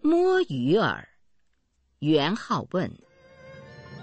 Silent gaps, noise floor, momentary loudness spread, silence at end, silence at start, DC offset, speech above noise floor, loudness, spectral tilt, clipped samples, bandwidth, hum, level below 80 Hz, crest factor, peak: none; -70 dBFS; 19 LU; 0 s; 0.05 s; under 0.1%; 45 dB; -25 LUFS; -6.5 dB/octave; under 0.1%; 8.4 kHz; none; -62 dBFS; 18 dB; -8 dBFS